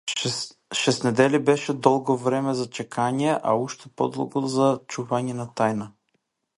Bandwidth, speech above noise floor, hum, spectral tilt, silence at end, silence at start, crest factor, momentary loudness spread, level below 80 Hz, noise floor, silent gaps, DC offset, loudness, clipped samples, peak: 11.5 kHz; 50 dB; none; -5 dB/octave; 0.7 s; 0.05 s; 22 dB; 9 LU; -68 dBFS; -73 dBFS; none; under 0.1%; -24 LUFS; under 0.1%; -2 dBFS